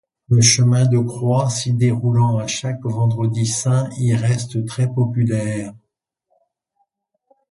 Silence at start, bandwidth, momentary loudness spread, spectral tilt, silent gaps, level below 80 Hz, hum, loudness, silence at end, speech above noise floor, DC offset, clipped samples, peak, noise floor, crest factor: 0.3 s; 11.5 kHz; 9 LU; -5 dB/octave; none; -52 dBFS; none; -18 LUFS; 1.8 s; 58 dB; under 0.1%; under 0.1%; 0 dBFS; -75 dBFS; 18 dB